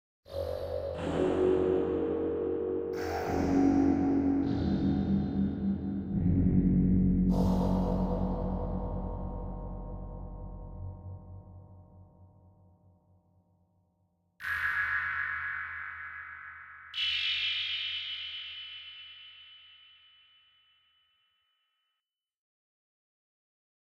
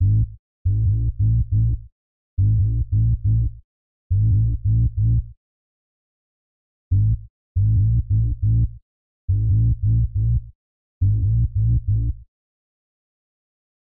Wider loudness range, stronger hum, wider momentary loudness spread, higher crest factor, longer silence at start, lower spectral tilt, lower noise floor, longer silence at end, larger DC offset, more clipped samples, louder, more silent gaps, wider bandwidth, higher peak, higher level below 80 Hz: first, 17 LU vs 3 LU; neither; first, 18 LU vs 9 LU; first, 18 dB vs 10 dB; first, 0.3 s vs 0 s; second, -7 dB/octave vs -24.5 dB/octave; about the same, -88 dBFS vs under -90 dBFS; first, 4.4 s vs 1.55 s; second, under 0.1% vs 1%; neither; second, -31 LUFS vs -21 LUFS; second, none vs 0.39-0.65 s, 1.92-2.37 s, 3.64-4.10 s, 5.37-6.91 s, 7.30-7.55 s, 8.82-9.28 s, 10.55-11.01 s; first, 8.2 kHz vs 0.5 kHz; about the same, -14 dBFS vs -12 dBFS; second, -44 dBFS vs -28 dBFS